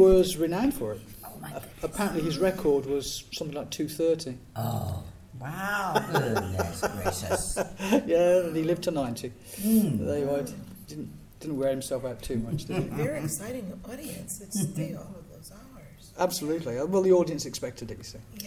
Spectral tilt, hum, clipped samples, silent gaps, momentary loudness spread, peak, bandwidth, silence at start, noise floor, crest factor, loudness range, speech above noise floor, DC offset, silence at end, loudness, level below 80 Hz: -5.5 dB/octave; none; under 0.1%; none; 17 LU; -8 dBFS; 16 kHz; 0 s; -49 dBFS; 20 dB; 6 LU; 21 dB; under 0.1%; 0 s; -28 LUFS; -48 dBFS